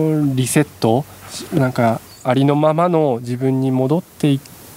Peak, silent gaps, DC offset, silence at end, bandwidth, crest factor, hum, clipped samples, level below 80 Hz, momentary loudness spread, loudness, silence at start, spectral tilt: 0 dBFS; none; under 0.1%; 0 s; 16 kHz; 16 dB; none; under 0.1%; -56 dBFS; 7 LU; -17 LUFS; 0 s; -6.5 dB/octave